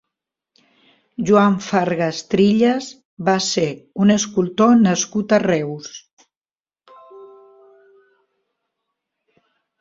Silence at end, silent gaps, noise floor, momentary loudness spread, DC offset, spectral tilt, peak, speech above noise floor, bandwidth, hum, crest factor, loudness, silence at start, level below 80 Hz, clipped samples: 2.55 s; 3.05-3.17 s, 6.13-6.17 s, 6.37-6.41 s; under -90 dBFS; 14 LU; under 0.1%; -5 dB/octave; -2 dBFS; over 73 dB; 7.8 kHz; none; 18 dB; -17 LUFS; 1.2 s; -60 dBFS; under 0.1%